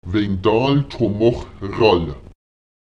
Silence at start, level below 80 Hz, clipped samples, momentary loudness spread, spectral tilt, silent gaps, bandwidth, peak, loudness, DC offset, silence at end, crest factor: 0.05 s; -40 dBFS; under 0.1%; 13 LU; -8 dB/octave; none; 7.8 kHz; -2 dBFS; -18 LUFS; 0.4%; 0.7 s; 16 dB